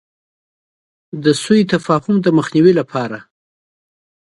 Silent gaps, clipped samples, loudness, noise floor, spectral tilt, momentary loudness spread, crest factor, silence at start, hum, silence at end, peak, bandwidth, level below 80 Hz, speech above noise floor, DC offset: none; under 0.1%; -15 LUFS; under -90 dBFS; -6 dB/octave; 13 LU; 16 dB; 1.15 s; none; 1 s; 0 dBFS; 11.5 kHz; -58 dBFS; over 76 dB; under 0.1%